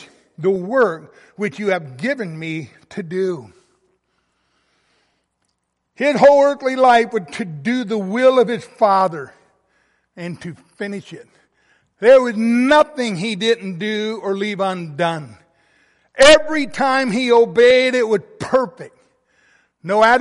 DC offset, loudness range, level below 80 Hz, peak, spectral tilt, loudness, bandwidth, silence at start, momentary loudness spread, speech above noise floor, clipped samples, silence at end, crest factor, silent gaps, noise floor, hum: under 0.1%; 11 LU; -52 dBFS; 0 dBFS; -4.5 dB/octave; -16 LUFS; 11.5 kHz; 0 s; 18 LU; 55 dB; under 0.1%; 0 s; 18 dB; none; -72 dBFS; none